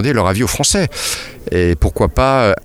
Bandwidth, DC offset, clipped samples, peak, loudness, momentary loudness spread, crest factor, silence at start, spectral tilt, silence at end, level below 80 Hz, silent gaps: 16.5 kHz; under 0.1%; under 0.1%; 0 dBFS; -15 LUFS; 7 LU; 14 dB; 0 s; -4.5 dB/octave; 0.05 s; -26 dBFS; none